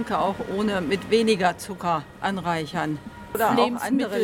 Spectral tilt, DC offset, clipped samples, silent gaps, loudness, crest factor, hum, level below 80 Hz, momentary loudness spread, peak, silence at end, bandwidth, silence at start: -5 dB/octave; under 0.1%; under 0.1%; none; -24 LUFS; 18 dB; none; -52 dBFS; 8 LU; -6 dBFS; 0 s; 17.5 kHz; 0 s